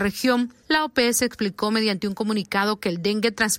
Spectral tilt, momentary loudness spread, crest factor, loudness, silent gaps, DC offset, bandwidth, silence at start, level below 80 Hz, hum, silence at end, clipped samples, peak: -3.5 dB/octave; 5 LU; 16 dB; -23 LUFS; none; under 0.1%; 16.5 kHz; 0 s; -54 dBFS; none; 0 s; under 0.1%; -8 dBFS